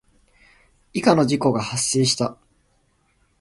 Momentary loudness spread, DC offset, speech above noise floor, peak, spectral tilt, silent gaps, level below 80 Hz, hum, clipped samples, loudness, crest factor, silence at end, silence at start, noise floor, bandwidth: 8 LU; under 0.1%; 44 dB; -2 dBFS; -4.5 dB/octave; none; -56 dBFS; none; under 0.1%; -20 LUFS; 22 dB; 1.05 s; 0.95 s; -64 dBFS; 11.5 kHz